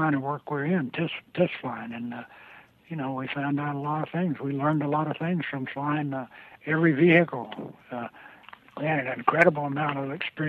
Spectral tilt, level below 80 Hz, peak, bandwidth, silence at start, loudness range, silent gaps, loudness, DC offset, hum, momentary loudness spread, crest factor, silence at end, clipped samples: -8.5 dB/octave; -70 dBFS; -4 dBFS; 7.2 kHz; 0 s; 6 LU; none; -27 LUFS; under 0.1%; none; 17 LU; 24 dB; 0 s; under 0.1%